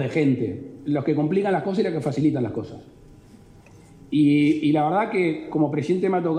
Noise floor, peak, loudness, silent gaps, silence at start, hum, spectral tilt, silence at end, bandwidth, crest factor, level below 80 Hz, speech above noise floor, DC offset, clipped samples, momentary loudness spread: -48 dBFS; -10 dBFS; -22 LUFS; none; 0 s; none; -8 dB/octave; 0 s; 9.4 kHz; 14 dB; -60 dBFS; 27 dB; under 0.1%; under 0.1%; 8 LU